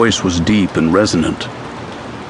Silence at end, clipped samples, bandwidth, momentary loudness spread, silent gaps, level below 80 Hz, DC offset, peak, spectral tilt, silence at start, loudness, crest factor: 0 s; under 0.1%; 10.5 kHz; 15 LU; none; -38 dBFS; under 0.1%; 0 dBFS; -5 dB/octave; 0 s; -15 LUFS; 16 dB